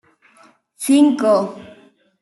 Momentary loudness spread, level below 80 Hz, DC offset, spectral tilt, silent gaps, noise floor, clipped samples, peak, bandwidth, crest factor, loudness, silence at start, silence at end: 15 LU; -70 dBFS; under 0.1%; -4.5 dB/octave; none; -52 dBFS; under 0.1%; -4 dBFS; 12 kHz; 16 dB; -16 LUFS; 0.8 s; 0.55 s